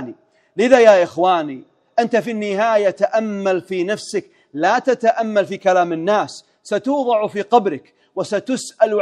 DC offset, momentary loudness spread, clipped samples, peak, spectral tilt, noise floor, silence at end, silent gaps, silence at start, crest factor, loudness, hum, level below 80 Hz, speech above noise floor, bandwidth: under 0.1%; 13 LU; under 0.1%; 0 dBFS; -5 dB/octave; -40 dBFS; 0 s; none; 0 s; 18 dB; -17 LUFS; none; -68 dBFS; 23 dB; 11.5 kHz